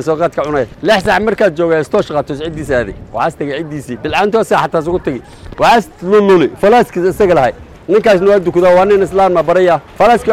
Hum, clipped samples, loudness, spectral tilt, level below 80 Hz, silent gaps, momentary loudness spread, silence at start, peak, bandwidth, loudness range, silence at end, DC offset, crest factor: none; under 0.1%; -12 LUFS; -6 dB/octave; -38 dBFS; none; 11 LU; 0 s; -2 dBFS; 15.5 kHz; 5 LU; 0 s; under 0.1%; 8 dB